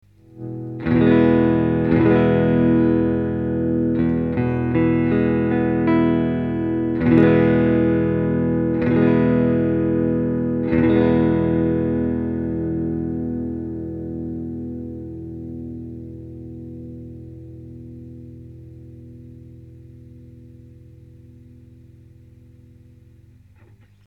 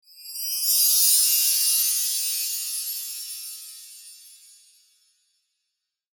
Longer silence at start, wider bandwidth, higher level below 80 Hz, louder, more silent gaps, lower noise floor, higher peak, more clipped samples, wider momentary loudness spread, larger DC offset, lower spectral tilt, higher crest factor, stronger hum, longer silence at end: first, 0.35 s vs 0.15 s; second, 4.6 kHz vs 19 kHz; first, -40 dBFS vs under -90 dBFS; about the same, -19 LUFS vs -20 LUFS; neither; second, -50 dBFS vs -82 dBFS; first, 0 dBFS vs -6 dBFS; neither; about the same, 22 LU vs 21 LU; neither; first, -11 dB/octave vs 9.5 dB/octave; about the same, 20 dB vs 20 dB; first, 50 Hz at -50 dBFS vs none; first, 3.6 s vs 1.85 s